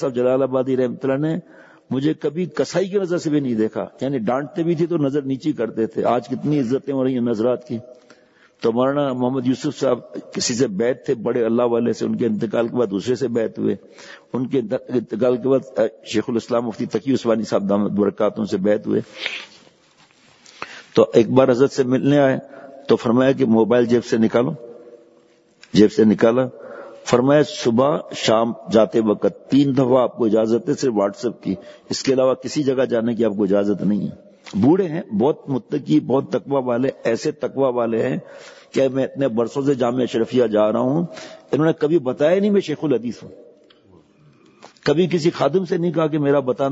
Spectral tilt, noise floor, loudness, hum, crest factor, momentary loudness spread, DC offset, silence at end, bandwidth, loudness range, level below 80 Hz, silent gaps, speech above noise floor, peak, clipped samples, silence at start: -6.5 dB/octave; -54 dBFS; -20 LUFS; none; 20 dB; 9 LU; under 0.1%; 0 s; 8 kHz; 4 LU; -62 dBFS; none; 36 dB; 0 dBFS; under 0.1%; 0 s